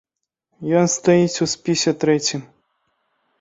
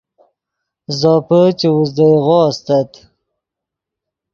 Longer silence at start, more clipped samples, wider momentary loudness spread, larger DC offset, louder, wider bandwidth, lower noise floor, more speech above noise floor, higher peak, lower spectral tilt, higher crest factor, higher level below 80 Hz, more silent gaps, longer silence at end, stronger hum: second, 0.6 s vs 0.9 s; neither; about the same, 8 LU vs 6 LU; neither; second, -18 LUFS vs -13 LUFS; first, 8 kHz vs 7.2 kHz; second, -76 dBFS vs -82 dBFS; second, 58 dB vs 70 dB; about the same, -2 dBFS vs 0 dBFS; second, -4.5 dB/octave vs -7.5 dB/octave; about the same, 18 dB vs 14 dB; about the same, -60 dBFS vs -58 dBFS; neither; second, 0.95 s vs 1.5 s; neither